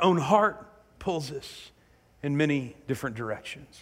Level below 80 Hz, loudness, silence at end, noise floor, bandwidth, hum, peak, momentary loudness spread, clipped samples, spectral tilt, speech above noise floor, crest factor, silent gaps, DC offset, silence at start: -60 dBFS; -28 LUFS; 0 s; -61 dBFS; 16 kHz; none; -8 dBFS; 18 LU; under 0.1%; -6 dB/octave; 33 dB; 20 dB; none; under 0.1%; 0 s